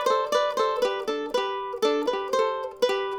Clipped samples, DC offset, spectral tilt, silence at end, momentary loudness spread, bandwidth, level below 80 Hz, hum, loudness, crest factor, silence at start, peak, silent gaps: under 0.1%; under 0.1%; -2 dB/octave; 0 s; 4 LU; 19 kHz; -62 dBFS; none; -26 LUFS; 14 dB; 0 s; -10 dBFS; none